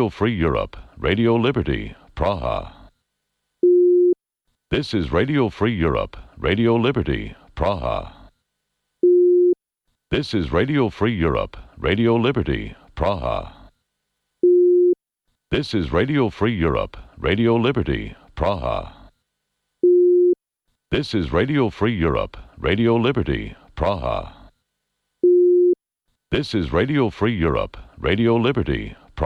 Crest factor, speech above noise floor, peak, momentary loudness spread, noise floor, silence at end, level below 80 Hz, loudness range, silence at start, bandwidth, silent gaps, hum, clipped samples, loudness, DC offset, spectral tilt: 12 dB; 56 dB; -8 dBFS; 12 LU; -77 dBFS; 0 s; -36 dBFS; 3 LU; 0 s; 6.4 kHz; none; none; under 0.1%; -20 LUFS; under 0.1%; -8 dB/octave